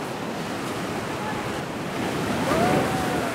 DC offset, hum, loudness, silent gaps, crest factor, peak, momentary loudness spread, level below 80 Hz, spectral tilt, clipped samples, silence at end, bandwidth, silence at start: under 0.1%; none; -26 LUFS; none; 18 dB; -8 dBFS; 8 LU; -50 dBFS; -5 dB/octave; under 0.1%; 0 s; 16 kHz; 0 s